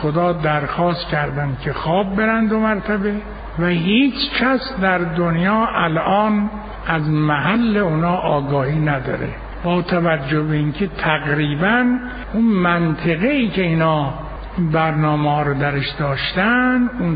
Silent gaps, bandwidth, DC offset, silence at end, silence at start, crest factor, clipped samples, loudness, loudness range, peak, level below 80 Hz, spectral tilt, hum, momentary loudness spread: none; 5 kHz; under 0.1%; 0 s; 0 s; 16 dB; under 0.1%; -18 LUFS; 2 LU; -2 dBFS; -36 dBFS; -5 dB/octave; none; 7 LU